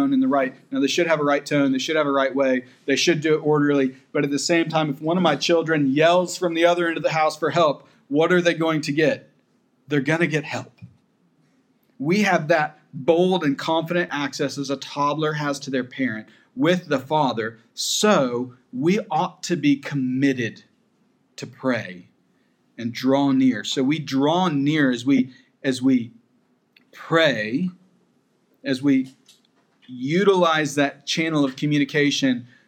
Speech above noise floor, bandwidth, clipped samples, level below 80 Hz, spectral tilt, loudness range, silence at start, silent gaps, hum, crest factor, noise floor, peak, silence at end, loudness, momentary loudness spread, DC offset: 43 dB; 15.5 kHz; under 0.1%; -82 dBFS; -5 dB/octave; 5 LU; 0 s; none; none; 18 dB; -64 dBFS; -4 dBFS; 0.25 s; -21 LUFS; 9 LU; under 0.1%